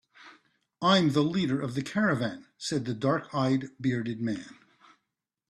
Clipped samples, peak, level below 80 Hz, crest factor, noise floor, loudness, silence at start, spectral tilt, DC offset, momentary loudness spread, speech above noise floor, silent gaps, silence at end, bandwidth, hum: under 0.1%; -10 dBFS; -66 dBFS; 20 dB; -84 dBFS; -28 LUFS; 0.2 s; -6 dB/octave; under 0.1%; 11 LU; 56 dB; none; 1 s; 12.5 kHz; none